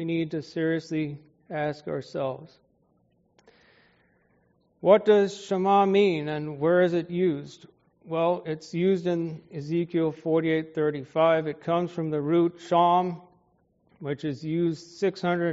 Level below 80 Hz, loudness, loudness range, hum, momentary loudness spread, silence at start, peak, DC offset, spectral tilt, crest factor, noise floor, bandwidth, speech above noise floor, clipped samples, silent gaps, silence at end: -70 dBFS; -26 LUFS; 10 LU; none; 12 LU; 0 s; -6 dBFS; under 0.1%; -5.5 dB/octave; 20 dB; -67 dBFS; 7.6 kHz; 42 dB; under 0.1%; none; 0 s